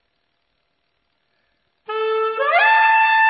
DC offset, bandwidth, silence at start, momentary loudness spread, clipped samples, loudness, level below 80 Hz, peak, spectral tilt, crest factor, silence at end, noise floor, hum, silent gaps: under 0.1%; 5 kHz; 1.9 s; 11 LU; under 0.1%; -16 LUFS; -82 dBFS; -4 dBFS; -3 dB/octave; 14 dB; 0 s; -70 dBFS; none; none